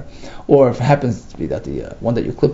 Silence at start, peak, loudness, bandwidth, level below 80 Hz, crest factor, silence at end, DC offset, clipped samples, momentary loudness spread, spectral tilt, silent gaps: 0 s; 0 dBFS; -17 LUFS; 7.8 kHz; -38 dBFS; 18 dB; 0 s; under 0.1%; under 0.1%; 14 LU; -8 dB/octave; none